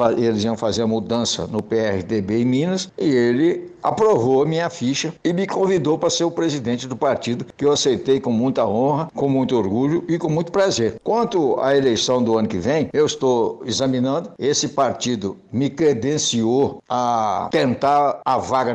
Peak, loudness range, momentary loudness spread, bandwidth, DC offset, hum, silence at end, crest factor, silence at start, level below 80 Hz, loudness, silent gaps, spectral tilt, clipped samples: -4 dBFS; 1 LU; 5 LU; 9 kHz; under 0.1%; none; 0 s; 14 dB; 0 s; -56 dBFS; -20 LUFS; none; -5 dB/octave; under 0.1%